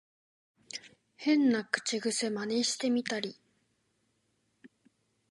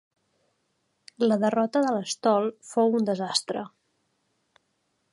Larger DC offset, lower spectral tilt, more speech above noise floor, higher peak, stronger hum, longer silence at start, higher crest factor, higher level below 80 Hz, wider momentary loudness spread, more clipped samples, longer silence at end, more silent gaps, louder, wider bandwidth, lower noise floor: neither; second, -3 dB/octave vs -4.5 dB/octave; second, 46 dB vs 50 dB; about the same, -10 dBFS vs -8 dBFS; neither; second, 0.75 s vs 1.2 s; about the same, 24 dB vs 20 dB; about the same, -84 dBFS vs -80 dBFS; first, 17 LU vs 7 LU; neither; second, 0.65 s vs 1.45 s; neither; second, -30 LUFS vs -25 LUFS; about the same, 11.5 kHz vs 11.5 kHz; about the same, -76 dBFS vs -74 dBFS